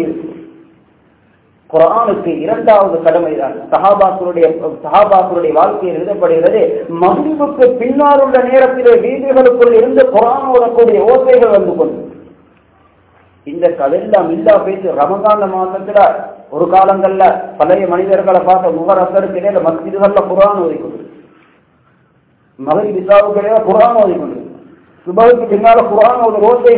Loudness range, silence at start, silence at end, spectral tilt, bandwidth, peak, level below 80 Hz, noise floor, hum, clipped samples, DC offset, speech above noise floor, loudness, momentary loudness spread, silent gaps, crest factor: 6 LU; 0 s; 0 s; -10 dB/octave; 4 kHz; 0 dBFS; -50 dBFS; -52 dBFS; none; 2%; under 0.1%; 42 dB; -10 LUFS; 9 LU; none; 10 dB